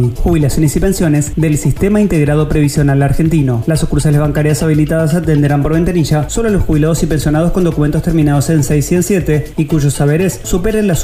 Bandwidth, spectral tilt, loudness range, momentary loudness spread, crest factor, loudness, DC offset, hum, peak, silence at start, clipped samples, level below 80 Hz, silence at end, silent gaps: 16 kHz; -6.5 dB/octave; 1 LU; 2 LU; 10 dB; -12 LUFS; under 0.1%; none; 0 dBFS; 0 s; under 0.1%; -22 dBFS; 0 s; none